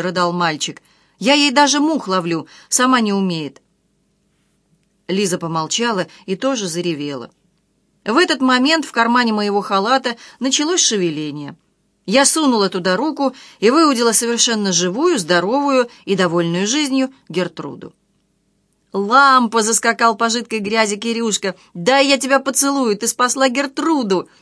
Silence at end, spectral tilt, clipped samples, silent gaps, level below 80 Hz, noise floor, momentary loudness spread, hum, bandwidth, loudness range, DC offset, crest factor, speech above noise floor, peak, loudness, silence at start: 0.15 s; -3 dB/octave; under 0.1%; none; -68 dBFS; -63 dBFS; 11 LU; none; 11 kHz; 6 LU; under 0.1%; 18 dB; 47 dB; 0 dBFS; -16 LUFS; 0 s